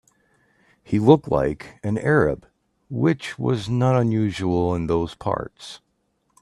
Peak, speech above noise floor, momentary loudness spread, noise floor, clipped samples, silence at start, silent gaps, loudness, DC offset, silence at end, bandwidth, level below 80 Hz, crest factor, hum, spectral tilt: -2 dBFS; 49 dB; 14 LU; -69 dBFS; under 0.1%; 0.9 s; none; -22 LUFS; under 0.1%; 0.65 s; 11.5 kHz; -48 dBFS; 20 dB; none; -7.5 dB/octave